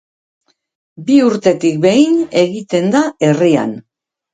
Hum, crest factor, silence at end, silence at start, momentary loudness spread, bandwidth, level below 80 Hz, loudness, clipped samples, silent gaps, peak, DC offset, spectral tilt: none; 14 dB; 0.55 s; 1 s; 6 LU; 9.4 kHz; -60 dBFS; -13 LUFS; under 0.1%; none; 0 dBFS; under 0.1%; -6 dB/octave